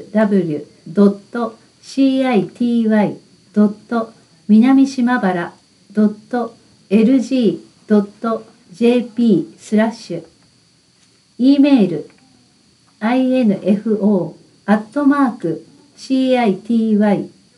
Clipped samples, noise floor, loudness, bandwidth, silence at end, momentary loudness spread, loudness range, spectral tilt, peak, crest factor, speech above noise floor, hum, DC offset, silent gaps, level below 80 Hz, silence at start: under 0.1%; -54 dBFS; -16 LUFS; 11.5 kHz; 0.3 s; 13 LU; 3 LU; -7.5 dB/octave; -2 dBFS; 16 dB; 39 dB; none; under 0.1%; none; -68 dBFS; 0 s